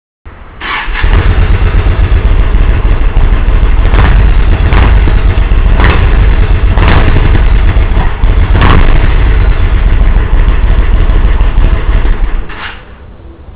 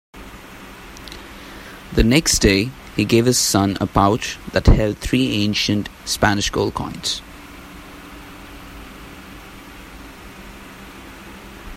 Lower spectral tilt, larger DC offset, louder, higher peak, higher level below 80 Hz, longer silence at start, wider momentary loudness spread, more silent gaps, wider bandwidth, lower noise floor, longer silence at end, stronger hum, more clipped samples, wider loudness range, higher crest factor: first, -10 dB/octave vs -4 dB/octave; neither; first, -10 LUFS vs -18 LUFS; about the same, 0 dBFS vs 0 dBFS; first, -6 dBFS vs -30 dBFS; about the same, 0.25 s vs 0.15 s; second, 5 LU vs 23 LU; neither; second, 4 kHz vs 16 kHz; second, -29 dBFS vs -38 dBFS; about the same, 0 s vs 0 s; neither; first, 7% vs under 0.1%; second, 3 LU vs 21 LU; second, 6 dB vs 20 dB